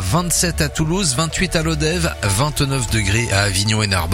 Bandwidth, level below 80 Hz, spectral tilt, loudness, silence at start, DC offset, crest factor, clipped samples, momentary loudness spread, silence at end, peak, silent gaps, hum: 16.5 kHz; -30 dBFS; -4 dB/octave; -17 LUFS; 0 s; under 0.1%; 18 dB; under 0.1%; 3 LU; 0 s; 0 dBFS; none; none